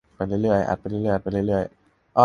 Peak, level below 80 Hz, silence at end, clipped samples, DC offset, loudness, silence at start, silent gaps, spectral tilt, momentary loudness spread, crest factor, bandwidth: -2 dBFS; -46 dBFS; 0 s; under 0.1%; under 0.1%; -24 LUFS; 0.2 s; none; -8.5 dB/octave; 5 LU; 22 dB; 10 kHz